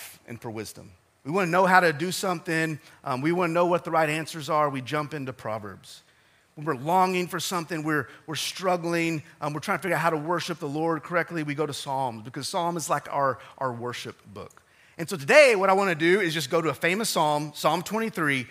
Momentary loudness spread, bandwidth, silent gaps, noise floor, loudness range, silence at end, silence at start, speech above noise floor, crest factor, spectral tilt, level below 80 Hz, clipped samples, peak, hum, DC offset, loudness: 15 LU; 16 kHz; none; -61 dBFS; 7 LU; 0 s; 0 s; 36 dB; 24 dB; -4.5 dB/octave; -72 dBFS; under 0.1%; -2 dBFS; none; under 0.1%; -25 LUFS